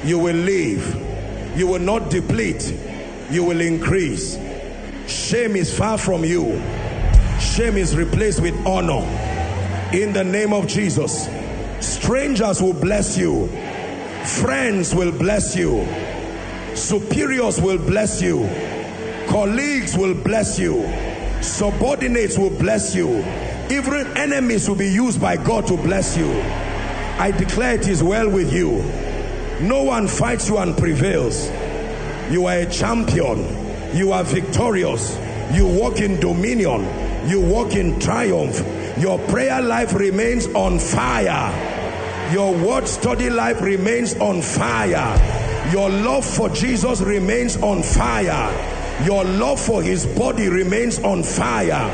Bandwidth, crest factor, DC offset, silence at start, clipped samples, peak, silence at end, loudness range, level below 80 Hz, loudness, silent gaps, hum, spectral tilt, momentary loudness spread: 9.4 kHz; 18 dB; under 0.1%; 0 s; under 0.1%; 0 dBFS; 0 s; 2 LU; -28 dBFS; -19 LUFS; none; none; -5 dB/octave; 8 LU